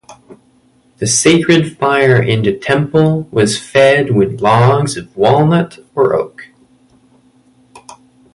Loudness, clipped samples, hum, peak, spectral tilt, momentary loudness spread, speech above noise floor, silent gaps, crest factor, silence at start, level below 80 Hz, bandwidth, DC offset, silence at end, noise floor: -12 LUFS; under 0.1%; none; 0 dBFS; -5 dB/octave; 6 LU; 40 dB; none; 14 dB; 0.1 s; -48 dBFS; 11.5 kHz; under 0.1%; 0.4 s; -52 dBFS